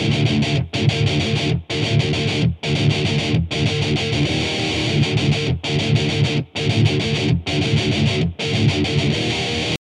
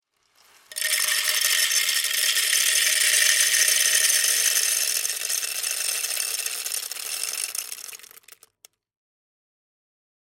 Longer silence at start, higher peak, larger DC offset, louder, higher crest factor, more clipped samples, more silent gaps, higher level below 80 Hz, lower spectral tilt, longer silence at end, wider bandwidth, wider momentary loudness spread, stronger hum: second, 0 s vs 0.7 s; about the same, -6 dBFS vs -4 dBFS; neither; about the same, -19 LUFS vs -20 LUFS; second, 14 dB vs 22 dB; neither; neither; first, -38 dBFS vs -76 dBFS; first, -5.5 dB/octave vs 5.5 dB/octave; second, 0.15 s vs 2.35 s; second, 11 kHz vs 17 kHz; second, 3 LU vs 11 LU; neither